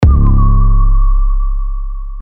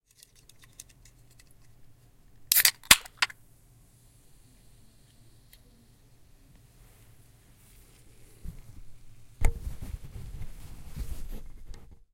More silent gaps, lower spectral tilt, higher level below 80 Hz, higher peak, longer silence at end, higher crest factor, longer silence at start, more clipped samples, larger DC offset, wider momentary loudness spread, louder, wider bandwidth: neither; first, -10 dB/octave vs -0.5 dB/octave; first, -10 dBFS vs -42 dBFS; about the same, 0 dBFS vs 0 dBFS; second, 0 s vs 0.2 s; second, 8 dB vs 34 dB; second, 0 s vs 1.8 s; first, 0.1% vs under 0.1%; neither; second, 13 LU vs 30 LU; first, -14 LUFS vs -24 LUFS; second, 2.5 kHz vs 16.5 kHz